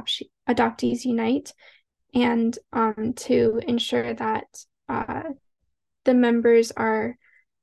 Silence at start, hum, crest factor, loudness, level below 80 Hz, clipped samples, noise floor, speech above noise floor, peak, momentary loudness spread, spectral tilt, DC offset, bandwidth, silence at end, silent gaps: 0 s; none; 16 dB; -23 LUFS; -58 dBFS; under 0.1%; -79 dBFS; 56 dB; -6 dBFS; 13 LU; -5 dB/octave; under 0.1%; 12.5 kHz; 0.5 s; none